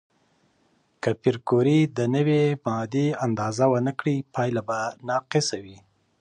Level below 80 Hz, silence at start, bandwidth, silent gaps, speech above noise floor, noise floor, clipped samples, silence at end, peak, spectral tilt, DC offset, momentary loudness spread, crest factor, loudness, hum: -64 dBFS; 1.05 s; 10 kHz; none; 42 dB; -66 dBFS; under 0.1%; 0.45 s; -8 dBFS; -6 dB/octave; under 0.1%; 8 LU; 16 dB; -24 LUFS; none